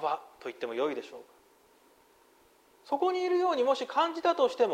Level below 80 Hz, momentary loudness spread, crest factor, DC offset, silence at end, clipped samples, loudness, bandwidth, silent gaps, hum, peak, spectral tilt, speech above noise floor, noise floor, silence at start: -80 dBFS; 14 LU; 18 dB; under 0.1%; 0 s; under 0.1%; -30 LUFS; 13.5 kHz; none; none; -14 dBFS; -3.5 dB/octave; 34 dB; -63 dBFS; 0 s